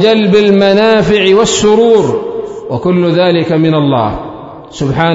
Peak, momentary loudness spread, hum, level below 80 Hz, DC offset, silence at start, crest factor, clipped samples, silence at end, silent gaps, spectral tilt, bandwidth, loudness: 0 dBFS; 13 LU; none; -38 dBFS; under 0.1%; 0 s; 10 dB; 0.3%; 0 s; none; -5.5 dB/octave; 8 kHz; -9 LUFS